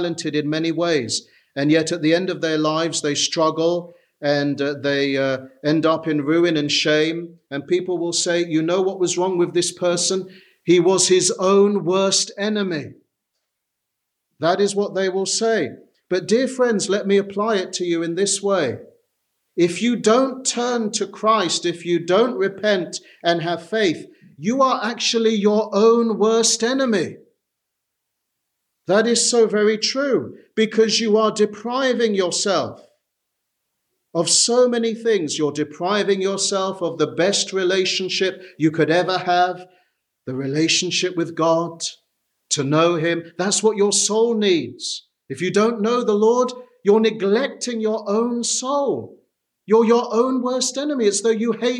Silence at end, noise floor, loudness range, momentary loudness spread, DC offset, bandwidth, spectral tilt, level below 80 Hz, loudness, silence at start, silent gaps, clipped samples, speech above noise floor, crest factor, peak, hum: 0 s; -79 dBFS; 3 LU; 8 LU; under 0.1%; 12 kHz; -3.5 dB/octave; -72 dBFS; -19 LUFS; 0 s; none; under 0.1%; 60 dB; 16 dB; -4 dBFS; none